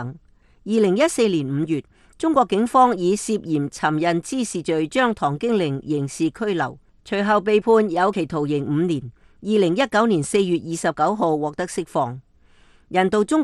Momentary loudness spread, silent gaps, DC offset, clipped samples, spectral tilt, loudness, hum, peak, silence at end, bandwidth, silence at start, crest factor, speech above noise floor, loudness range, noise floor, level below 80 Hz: 8 LU; none; under 0.1%; under 0.1%; -5.5 dB/octave; -21 LUFS; none; -4 dBFS; 0 s; 12.5 kHz; 0 s; 18 dB; 33 dB; 2 LU; -53 dBFS; -56 dBFS